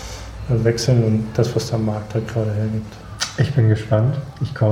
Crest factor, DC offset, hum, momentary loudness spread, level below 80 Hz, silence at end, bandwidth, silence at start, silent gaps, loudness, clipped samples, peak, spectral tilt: 16 dB; under 0.1%; none; 10 LU; -40 dBFS; 0 s; 12.5 kHz; 0 s; none; -20 LUFS; under 0.1%; -4 dBFS; -6.5 dB/octave